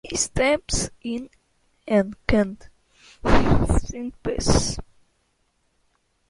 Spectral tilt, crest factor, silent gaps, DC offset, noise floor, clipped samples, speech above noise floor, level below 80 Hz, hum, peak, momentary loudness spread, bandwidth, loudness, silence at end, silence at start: -4.5 dB/octave; 22 dB; none; under 0.1%; -68 dBFS; under 0.1%; 47 dB; -32 dBFS; none; -2 dBFS; 13 LU; 11.5 kHz; -23 LUFS; 1.45 s; 0.05 s